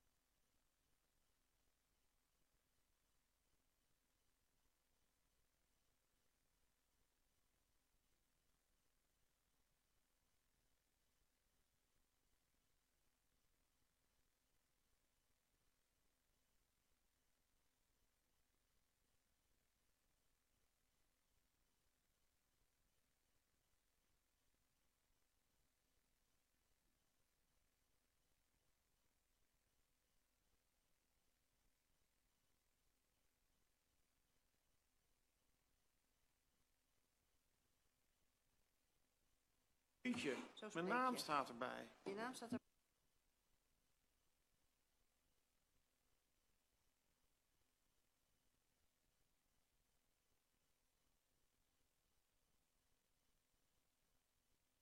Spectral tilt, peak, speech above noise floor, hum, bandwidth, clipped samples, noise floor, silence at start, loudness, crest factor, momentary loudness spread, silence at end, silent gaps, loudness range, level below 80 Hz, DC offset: -4 dB/octave; -28 dBFS; 39 dB; none; 10.5 kHz; under 0.1%; -86 dBFS; 40.05 s; -47 LUFS; 32 dB; 11 LU; 12.25 s; none; 11 LU; under -90 dBFS; under 0.1%